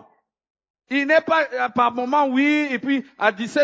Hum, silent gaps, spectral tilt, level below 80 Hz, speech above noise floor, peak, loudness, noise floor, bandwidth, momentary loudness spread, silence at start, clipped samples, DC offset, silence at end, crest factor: none; none; -4.5 dB/octave; -68 dBFS; 36 dB; -2 dBFS; -20 LUFS; -56 dBFS; 8 kHz; 6 LU; 0.9 s; under 0.1%; under 0.1%; 0 s; 20 dB